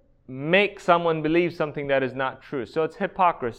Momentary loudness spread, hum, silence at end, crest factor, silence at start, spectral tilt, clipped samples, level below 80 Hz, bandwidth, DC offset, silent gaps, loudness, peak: 9 LU; none; 0.05 s; 20 dB; 0.3 s; -6.5 dB/octave; under 0.1%; -56 dBFS; 9.4 kHz; under 0.1%; none; -24 LUFS; -4 dBFS